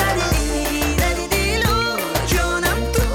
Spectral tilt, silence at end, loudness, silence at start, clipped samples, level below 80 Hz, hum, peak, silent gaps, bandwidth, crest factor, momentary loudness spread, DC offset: -4 dB/octave; 0 s; -19 LUFS; 0 s; under 0.1%; -24 dBFS; none; -8 dBFS; none; 18 kHz; 10 dB; 2 LU; under 0.1%